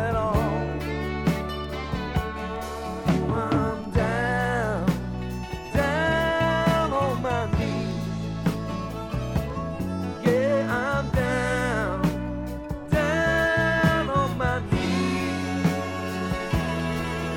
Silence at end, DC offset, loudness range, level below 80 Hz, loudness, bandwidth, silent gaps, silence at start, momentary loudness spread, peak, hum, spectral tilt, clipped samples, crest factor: 0 s; under 0.1%; 4 LU; -38 dBFS; -25 LUFS; 18 kHz; none; 0 s; 9 LU; -8 dBFS; none; -6.5 dB/octave; under 0.1%; 18 dB